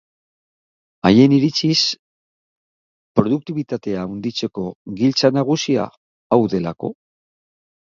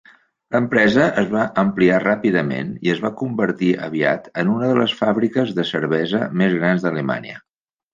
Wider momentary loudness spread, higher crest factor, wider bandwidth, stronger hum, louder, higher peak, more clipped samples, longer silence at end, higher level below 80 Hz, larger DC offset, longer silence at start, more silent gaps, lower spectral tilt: first, 15 LU vs 7 LU; about the same, 20 dB vs 18 dB; about the same, 7.4 kHz vs 7.6 kHz; neither; about the same, -18 LUFS vs -19 LUFS; about the same, 0 dBFS vs -2 dBFS; neither; first, 1 s vs 0.55 s; about the same, -54 dBFS vs -58 dBFS; neither; first, 1.05 s vs 0.5 s; first, 1.99-3.15 s, 4.75-4.85 s, 5.97-6.30 s vs none; second, -5.5 dB/octave vs -7 dB/octave